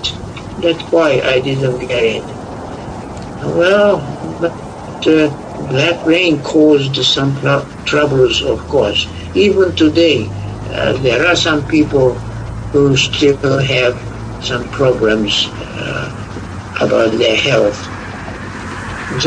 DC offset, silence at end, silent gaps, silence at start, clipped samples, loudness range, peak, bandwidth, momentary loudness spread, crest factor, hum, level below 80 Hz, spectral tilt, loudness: under 0.1%; 0 s; none; 0 s; under 0.1%; 4 LU; 0 dBFS; 10 kHz; 15 LU; 14 dB; none; -36 dBFS; -5 dB/octave; -13 LUFS